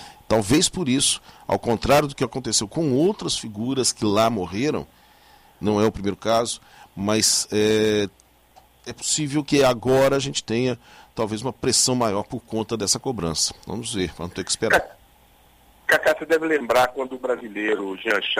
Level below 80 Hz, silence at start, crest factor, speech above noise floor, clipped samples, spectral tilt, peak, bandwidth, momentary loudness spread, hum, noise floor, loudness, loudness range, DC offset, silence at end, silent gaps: -48 dBFS; 0 s; 16 dB; 32 dB; under 0.1%; -3.5 dB/octave; -6 dBFS; 16 kHz; 10 LU; none; -55 dBFS; -22 LUFS; 3 LU; under 0.1%; 0 s; none